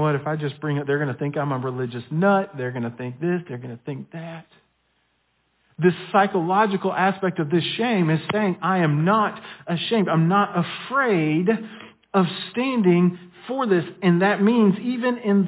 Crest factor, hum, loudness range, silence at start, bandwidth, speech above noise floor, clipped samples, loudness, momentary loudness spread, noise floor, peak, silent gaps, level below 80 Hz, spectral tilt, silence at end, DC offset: 16 dB; none; 6 LU; 0 s; 4 kHz; 47 dB; under 0.1%; -22 LUFS; 12 LU; -68 dBFS; -6 dBFS; none; -68 dBFS; -11 dB/octave; 0 s; under 0.1%